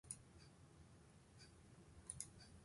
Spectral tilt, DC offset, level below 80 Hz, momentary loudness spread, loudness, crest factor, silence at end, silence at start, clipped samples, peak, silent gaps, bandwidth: -3 dB/octave; under 0.1%; -72 dBFS; 14 LU; -59 LUFS; 32 dB; 0 s; 0.05 s; under 0.1%; -30 dBFS; none; 11.5 kHz